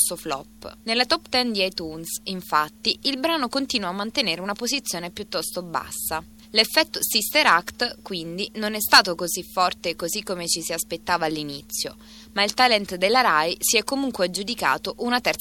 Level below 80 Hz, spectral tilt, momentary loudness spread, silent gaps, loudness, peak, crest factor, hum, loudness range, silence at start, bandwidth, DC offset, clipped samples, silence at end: -54 dBFS; -1.5 dB/octave; 12 LU; none; -22 LUFS; 0 dBFS; 24 dB; none; 5 LU; 0 s; 17.5 kHz; under 0.1%; under 0.1%; 0 s